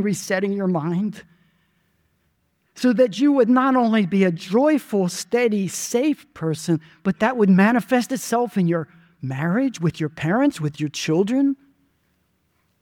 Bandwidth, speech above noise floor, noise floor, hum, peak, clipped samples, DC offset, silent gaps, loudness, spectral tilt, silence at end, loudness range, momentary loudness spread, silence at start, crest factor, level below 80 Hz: 18 kHz; 48 dB; -68 dBFS; none; -4 dBFS; under 0.1%; under 0.1%; none; -21 LUFS; -6 dB/octave; 1.3 s; 4 LU; 10 LU; 0 s; 16 dB; -64 dBFS